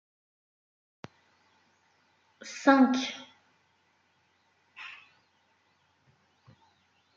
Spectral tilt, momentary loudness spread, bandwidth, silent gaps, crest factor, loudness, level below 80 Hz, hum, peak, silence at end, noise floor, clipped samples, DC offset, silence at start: -3.5 dB/octave; 29 LU; 7.6 kHz; none; 26 dB; -25 LUFS; -86 dBFS; none; -8 dBFS; 2.25 s; -70 dBFS; under 0.1%; under 0.1%; 2.45 s